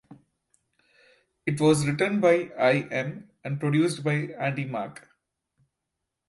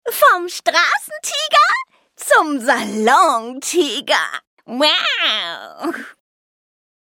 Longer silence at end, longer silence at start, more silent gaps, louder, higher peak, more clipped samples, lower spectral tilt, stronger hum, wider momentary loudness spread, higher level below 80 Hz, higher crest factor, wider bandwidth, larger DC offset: first, 1.35 s vs 0.95 s; about the same, 0.1 s vs 0.05 s; second, none vs 4.47-4.57 s; second, -25 LUFS vs -16 LUFS; second, -8 dBFS vs 0 dBFS; neither; first, -6 dB/octave vs -1 dB/octave; neither; about the same, 13 LU vs 13 LU; first, -64 dBFS vs -74 dBFS; about the same, 20 dB vs 18 dB; second, 11.5 kHz vs 18 kHz; neither